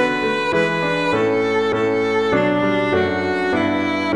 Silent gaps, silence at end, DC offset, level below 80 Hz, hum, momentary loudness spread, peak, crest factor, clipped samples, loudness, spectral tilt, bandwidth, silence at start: none; 0 s; 0.4%; -52 dBFS; none; 2 LU; -4 dBFS; 14 dB; under 0.1%; -18 LUFS; -6 dB/octave; 11 kHz; 0 s